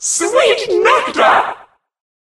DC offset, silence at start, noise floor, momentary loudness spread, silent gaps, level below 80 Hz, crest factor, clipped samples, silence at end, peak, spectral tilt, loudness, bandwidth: under 0.1%; 0 s; -36 dBFS; 7 LU; none; -56 dBFS; 14 dB; under 0.1%; 0.65 s; 0 dBFS; -0.5 dB/octave; -12 LUFS; 13 kHz